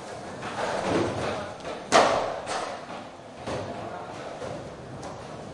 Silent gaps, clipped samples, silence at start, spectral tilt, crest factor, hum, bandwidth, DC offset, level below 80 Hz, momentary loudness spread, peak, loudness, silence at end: none; under 0.1%; 0 s; -4 dB/octave; 26 dB; none; 11.5 kHz; under 0.1%; -58 dBFS; 17 LU; -4 dBFS; -29 LUFS; 0 s